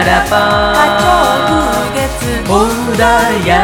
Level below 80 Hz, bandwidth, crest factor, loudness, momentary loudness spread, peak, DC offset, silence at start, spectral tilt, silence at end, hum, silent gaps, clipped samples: -26 dBFS; 19 kHz; 10 dB; -11 LUFS; 6 LU; 0 dBFS; under 0.1%; 0 s; -4 dB/octave; 0 s; none; none; under 0.1%